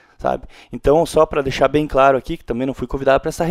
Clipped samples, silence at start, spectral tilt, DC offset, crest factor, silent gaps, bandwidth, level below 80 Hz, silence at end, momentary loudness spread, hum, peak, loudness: under 0.1%; 0.2 s; -6 dB/octave; under 0.1%; 18 dB; none; 15 kHz; -34 dBFS; 0 s; 9 LU; none; 0 dBFS; -18 LUFS